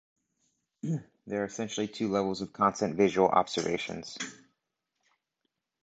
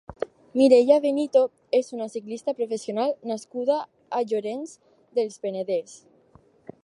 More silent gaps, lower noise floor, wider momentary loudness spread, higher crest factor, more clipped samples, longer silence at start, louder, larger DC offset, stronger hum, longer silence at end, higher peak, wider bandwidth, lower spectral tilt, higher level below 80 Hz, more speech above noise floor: neither; first, -83 dBFS vs -57 dBFS; about the same, 13 LU vs 15 LU; about the same, 24 dB vs 20 dB; neither; first, 0.85 s vs 0.1 s; second, -30 LUFS vs -24 LUFS; neither; neither; first, 1.5 s vs 0.85 s; second, -8 dBFS vs -4 dBFS; second, 9 kHz vs 11 kHz; about the same, -5 dB/octave vs -5 dB/octave; about the same, -66 dBFS vs -66 dBFS; first, 54 dB vs 34 dB